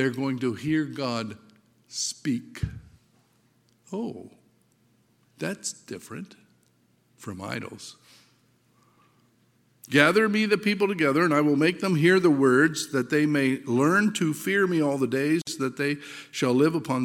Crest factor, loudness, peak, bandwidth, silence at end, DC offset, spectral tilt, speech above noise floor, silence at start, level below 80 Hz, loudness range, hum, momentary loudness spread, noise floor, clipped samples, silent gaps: 24 dB; -24 LUFS; -2 dBFS; 16.5 kHz; 0 s; under 0.1%; -5 dB/octave; 41 dB; 0 s; -56 dBFS; 17 LU; none; 18 LU; -65 dBFS; under 0.1%; none